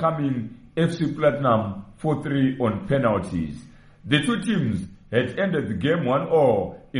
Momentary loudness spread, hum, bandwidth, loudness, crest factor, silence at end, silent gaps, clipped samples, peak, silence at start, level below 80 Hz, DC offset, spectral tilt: 10 LU; none; 11 kHz; -23 LUFS; 18 dB; 0 s; none; under 0.1%; -6 dBFS; 0 s; -50 dBFS; under 0.1%; -7 dB/octave